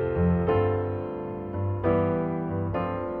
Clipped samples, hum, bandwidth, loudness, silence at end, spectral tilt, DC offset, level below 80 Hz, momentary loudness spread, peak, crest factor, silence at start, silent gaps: under 0.1%; none; 4.2 kHz; -27 LUFS; 0 s; -11.5 dB/octave; under 0.1%; -44 dBFS; 9 LU; -12 dBFS; 14 dB; 0 s; none